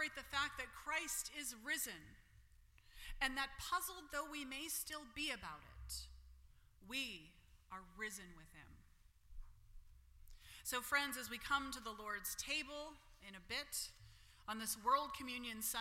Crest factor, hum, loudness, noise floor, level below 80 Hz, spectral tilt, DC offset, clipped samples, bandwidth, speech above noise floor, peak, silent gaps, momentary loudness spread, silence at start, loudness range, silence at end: 24 dB; none; -43 LUFS; -68 dBFS; -62 dBFS; -1 dB/octave; under 0.1%; under 0.1%; 16.5 kHz; 23 dB; -24 dBFS; none; 20 LU; 0 s; 8 LU; 0 s